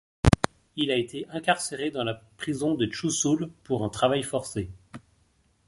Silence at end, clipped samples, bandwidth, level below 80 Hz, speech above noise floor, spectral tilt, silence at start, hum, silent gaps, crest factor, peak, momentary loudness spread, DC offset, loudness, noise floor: 0.7 s; under 0.1%; 11.5 kHz; -42 dBFS; 38 dB; -4.5 dB/octave; 0.25 s; none; none; 26 dB; -2 dBFS; 10 LU; under 0.1%; -27 LUFS; -66 dBFS